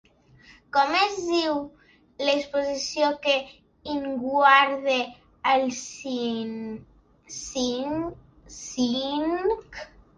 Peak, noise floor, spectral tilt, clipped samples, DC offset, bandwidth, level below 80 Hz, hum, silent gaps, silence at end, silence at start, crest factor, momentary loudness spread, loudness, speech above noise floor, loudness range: -4 dBFS; -54 dBFS; -2.5 dB/octave; under 0.1%; under 0.1%; 10 kHz; -58 dBFS; none; none; 0.3 s; 0.75 s; 22 dB; 17 LU; -25 LUFS; 30 dB; 7 LU